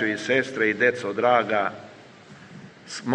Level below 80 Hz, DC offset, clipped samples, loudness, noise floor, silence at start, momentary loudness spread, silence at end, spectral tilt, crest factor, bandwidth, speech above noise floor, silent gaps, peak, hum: -72 dBFS; under 0.1%; under 0.1%; -23 LUFS; -47 dBFS; 0 s; 21 LU; 0 s; -4.5 dB/octave; 20 dB; 10 kHz; 24 dB; none; -6 dBFS; none